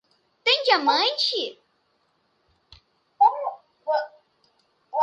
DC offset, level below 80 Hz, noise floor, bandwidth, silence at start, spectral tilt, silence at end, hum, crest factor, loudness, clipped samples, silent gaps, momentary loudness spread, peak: under 0.1%; -72 dBFS; -69 dBFS; 9.6 kHz; 0.45 s; -1 dB/octave; 0 s; none; 20 dB; -22 LUFS; under 0.1%; none; 15 LU; -6 dBFS